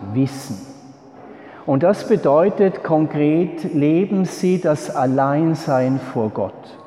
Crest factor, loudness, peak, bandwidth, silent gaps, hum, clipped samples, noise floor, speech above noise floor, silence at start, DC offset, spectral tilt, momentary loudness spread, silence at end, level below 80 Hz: 14 dB; -18 LUFS; -4 dBFS; 13.5 kHz; none; none; under 0.1%; -42 dBFS; 24 dB; 0 s; under 0.1%; -7.5 dB/octave; 11 LU; 0 s; -64 dBFS